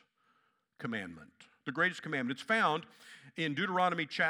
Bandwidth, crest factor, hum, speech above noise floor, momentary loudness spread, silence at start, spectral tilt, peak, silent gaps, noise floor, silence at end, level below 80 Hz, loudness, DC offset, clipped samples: 14 kHz; 20 dB; none; 40 dB; 18 LU; 0.8 s; -5 dB/octave; -16 dBFS; none; -75 dBFS; 0 s; -84 dBFS; -33 LUFS; under 0.1%; under 0.1%